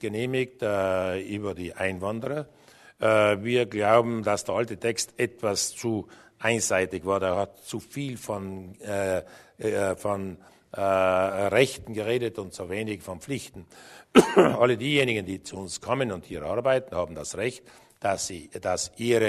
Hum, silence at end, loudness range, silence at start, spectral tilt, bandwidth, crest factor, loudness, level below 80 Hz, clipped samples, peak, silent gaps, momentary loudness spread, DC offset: none; 0 s; 5 LU; 0 s; -4.5 dB/octave; 13.5 kHz; 26 dB; -26 LUFS; -60 dBFS; under 0.1%; -2 dBFS; none; 13 LU; under 0.1%